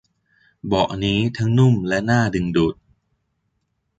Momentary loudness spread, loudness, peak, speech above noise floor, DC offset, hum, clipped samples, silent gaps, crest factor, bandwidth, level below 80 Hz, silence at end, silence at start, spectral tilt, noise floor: 6 LU; -19 LUFS; -4 dBFS; 54 dB; under 0.1%; none; under 0.1%; none; 16 dB; 7.8 kHz; -44 dBFS; 1.25 s; 0.65 s; -7 dB/octave; -72 dBFS